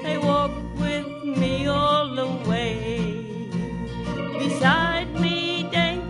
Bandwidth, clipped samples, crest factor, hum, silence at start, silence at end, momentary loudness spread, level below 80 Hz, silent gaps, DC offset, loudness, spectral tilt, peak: 11.5 kHz; under 0.1%; 18 dB; none; 0 s; 0 s; 9 LU; -42 dBFS; none; under 0.1%; -24 LUFS; -6 dB/octave; -6 dBFS